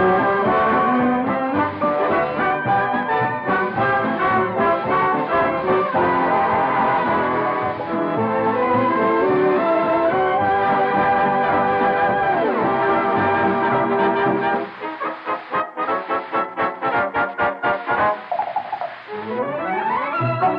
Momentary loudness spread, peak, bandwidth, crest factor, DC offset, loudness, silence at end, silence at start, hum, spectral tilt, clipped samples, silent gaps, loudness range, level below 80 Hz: 7 LU; -8 dBFS; 5.4 kHz; 12 dB; under 0.1%; -19 LUFS; 0 s; 0 s; none; -9 dB/octave; under 0.1%; none; 4 LU; -52 dBFS